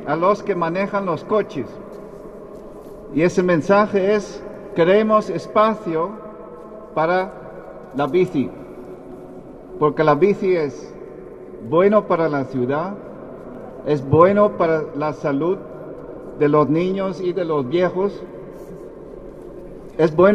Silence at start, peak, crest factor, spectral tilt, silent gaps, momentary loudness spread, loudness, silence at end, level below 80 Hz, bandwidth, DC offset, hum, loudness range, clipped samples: 0 s; 0 dBFS; 20 dB; -7.5 dB/octave; none; 21 LU; -19 LUFS; 0 s; -50 dBFS; 9.8 kHz; under 0.1%; none; 5 LU; under 0.1%